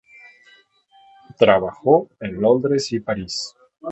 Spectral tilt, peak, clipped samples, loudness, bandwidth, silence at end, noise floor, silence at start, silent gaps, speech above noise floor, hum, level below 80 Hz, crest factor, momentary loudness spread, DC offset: -5 dB/octave; 0 dBFS; under 0.1%; -19 LUFS; 8.2 kHz; 0 s; -55 dBFS; 1.4 s; none; 36 dB; none; -54 dBFS; 20 dB; 14 LU; under 0.1%